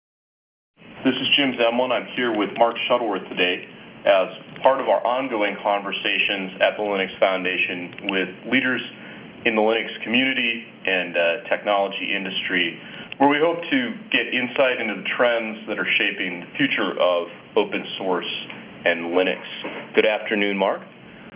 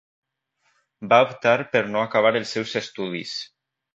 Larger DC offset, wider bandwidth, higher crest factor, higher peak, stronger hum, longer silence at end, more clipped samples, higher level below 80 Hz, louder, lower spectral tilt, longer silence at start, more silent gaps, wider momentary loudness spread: neither; second, 4 kHz vs 8 kHz; about the same, 20 dB vs 22 dB; about the same, -2 dBFS vs -2 dBFS; neither; second, 0 s vs 0.5 s; neither; about the same, -68 dBFS vs -68 dBFS; about the same, -21 LUFS vs -22 LUFS; first, -8 dB/octave vs -4.5 dB/octave; second, 0.8 s vs 1 s; neither; second, 7 LU vs 14 LU